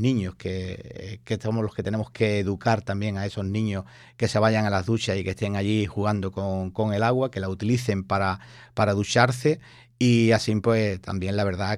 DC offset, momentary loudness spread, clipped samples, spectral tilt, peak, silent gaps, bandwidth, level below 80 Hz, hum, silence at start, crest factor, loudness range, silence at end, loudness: under 0.1%; 11 LU; under 0.1%; -6 dB/octave; -6 dBFS; none; 12.5 kHz; -54 dBFS; none; 0 s; 20 dB; 4 LU; 0 s; -25 LUFS